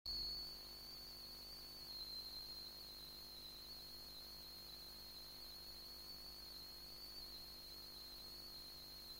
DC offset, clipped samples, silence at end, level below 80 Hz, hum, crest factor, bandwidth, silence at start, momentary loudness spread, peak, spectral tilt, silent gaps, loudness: under 0.1%; under 0.1%; 0 s; -68 dBFS; 50 Hz at -70 dBFS; 16 dB; 16.5 kHz; 0.05 s; 5 LU; -38 dBFS; -1.5 dB/octave; none; -51 LUFS